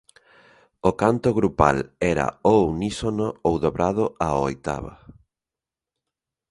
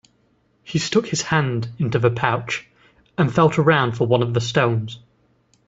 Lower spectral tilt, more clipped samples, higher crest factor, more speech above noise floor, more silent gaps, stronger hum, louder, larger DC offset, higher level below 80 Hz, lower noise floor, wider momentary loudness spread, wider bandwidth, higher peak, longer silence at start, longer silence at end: about the same, -6.5 dB/octave vs -5.5 dB/octave; neither; about the same, 24 dB vs 20 dB; first, 67 dB vs 43 dB; neither; neither; about the same, -22 LUFS vs -20 LUFS; neither; first, -42 dBFS vs -54 dBFS; first, -89 dBFS vs -62 dBFS; second, 7 LU vs 11 LU; first, 11.5 kHz vs 8 kHz; about the same, 0 dBFS vs 0 dBFS; first, 0.85 s vs 0.65 s; first, 1.55 s vs 0.7 s